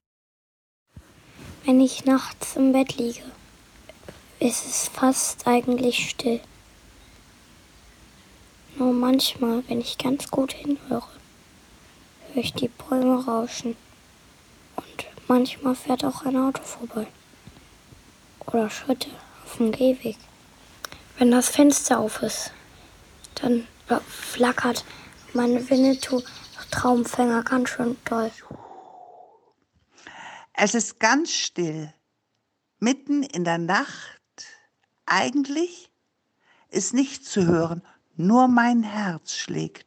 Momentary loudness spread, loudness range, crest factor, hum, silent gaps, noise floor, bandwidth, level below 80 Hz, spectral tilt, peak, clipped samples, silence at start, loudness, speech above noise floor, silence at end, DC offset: 20 LU; 6 LU; 22 dB; none; none; -75 dBFS; 18.5 kHz; -58 dBFS; -4 dB/octave; -4 dBFS; under 0.1%; 0.95 s; -23 LUFS; 53 dB; 0.1 s; under 0.1%